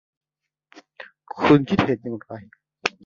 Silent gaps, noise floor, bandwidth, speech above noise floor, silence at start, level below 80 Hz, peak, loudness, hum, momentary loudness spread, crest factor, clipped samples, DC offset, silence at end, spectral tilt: none; -85 dBFS; 7.4 kHz; 64 dB; 1 s; -54 dBFS; -2 dBFS; -21 LUFS; none; 26 LU; 22 dB; under 0.1%; under 0.1%; 0.15 s; -6.5 dB/octave